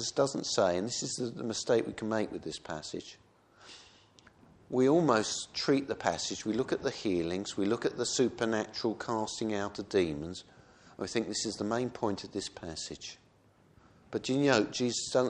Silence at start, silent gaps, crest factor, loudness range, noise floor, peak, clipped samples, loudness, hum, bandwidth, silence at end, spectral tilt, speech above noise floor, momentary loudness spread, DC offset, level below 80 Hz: 0 s; none; 22 dB; 6 LU; -64 dBFS; -10 dBFS; under 0.1%; -32 LUFS; none; 10.5 kHz; 0 s; -4 dB/octave; 32 dB; 13 LU; under 0.1%; -64 dBFS